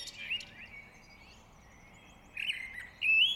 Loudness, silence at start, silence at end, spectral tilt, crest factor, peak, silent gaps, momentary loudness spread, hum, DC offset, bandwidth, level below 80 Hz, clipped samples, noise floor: -32 LUFS; 0 s; 0 s; 0 dB/octave; 20 dB; -16 dBFS; none; 28 LU; none; under 0.1%; 16 kHz; -64 dBFS; under 0.1%; -57 dBFS